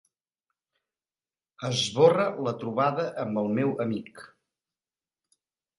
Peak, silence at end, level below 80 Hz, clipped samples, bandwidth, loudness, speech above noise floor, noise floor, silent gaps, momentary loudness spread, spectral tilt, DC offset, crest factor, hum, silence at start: -6 dBFS; 1.5 s; -72 dBFS; under 0.1%; 11.5 kHz; -26 LUFS; over 64 dB; under -90 dBFS; none; 12 LU; -5.5 dB/octave; under 0.1%; 22 dB; none; 1.6 s